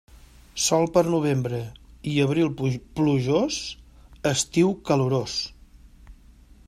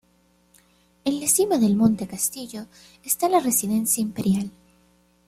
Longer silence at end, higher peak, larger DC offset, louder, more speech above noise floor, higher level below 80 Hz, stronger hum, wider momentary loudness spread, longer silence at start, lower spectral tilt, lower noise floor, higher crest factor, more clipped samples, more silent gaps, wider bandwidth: second, 0.55 s vs 0.8 s; about the same, -6 dBFS vs -6 dBFS; neither; about the same, -24 LUFS vs -22 LUFS; second, 28 dB vs 39 dB; first, -50 dBFS vs -60 dBFS; neither; about the same, 14 LU vs 16 LU; second, 0.15 s vs 1.05 s; about the same, -5 dB/octave vs -4.5 dB/octave; second, -51 dBFS vs -62 dBFS; about the same, 18 dB vs 18 dB; neither; neither; second, 14.5 kHz vs 16 kHz